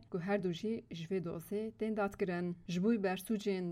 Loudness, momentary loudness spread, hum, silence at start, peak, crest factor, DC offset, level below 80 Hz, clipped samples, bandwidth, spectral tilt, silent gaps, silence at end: -37 LUFS; 7 LU; none; 0 s; -22 dBFS; 14 dB; under 0.1%; -68 dBFS; under 0.1%; 16 kHz; -6.5 dB/octave; none; 0 s